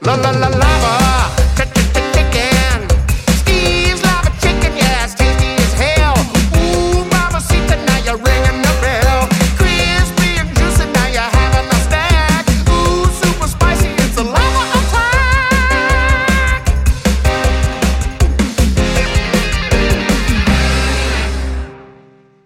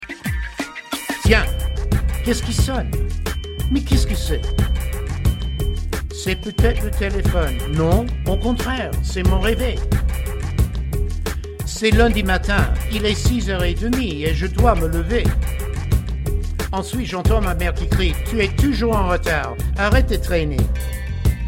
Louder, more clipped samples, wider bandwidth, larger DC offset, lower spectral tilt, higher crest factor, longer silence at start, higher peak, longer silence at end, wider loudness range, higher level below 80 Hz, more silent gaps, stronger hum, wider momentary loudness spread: first, -13 LUFS vs -20 LUFS; neither; about the same, 16.5 kHz vs 16.5 kHz; neither; about the same, -4.5 dB/octave vs -5.5 dB/octave; second, 12 dB vs 18 dB; about the same, 0 s vs 0 s; about the same, 0 dBFS vs 0 dBFS; first, 0.6 s vs 0 s; about the same, 2 LU vs 3 LU; first, -16 dBFS vs -22 dBFS; neither; neither; second, 3 LU vs 8 LU